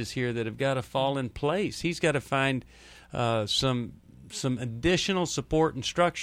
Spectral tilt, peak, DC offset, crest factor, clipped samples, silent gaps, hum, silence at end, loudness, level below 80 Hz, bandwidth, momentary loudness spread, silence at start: -4.5 dB/octave; -10 dBFS; under 0.1%; 18 dB; under 0.1%; none; none; 0 s; -28 LUFS; -50 dBFS; 15.5 kHz; 7 LU; 0 s